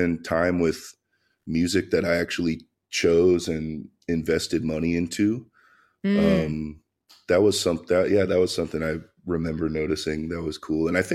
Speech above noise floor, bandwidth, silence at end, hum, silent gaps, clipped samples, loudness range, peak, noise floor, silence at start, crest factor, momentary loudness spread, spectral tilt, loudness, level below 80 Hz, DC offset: 36 dB; 14.5 kHz; 0 s; none; none; under 0.1%; 2 LU; -6 dBFS; -60 dBFS; 0 s; 18 dB; 11 LU; -5.5 dB/octave; -24 LUFS; -48 dBFS; under 0.1%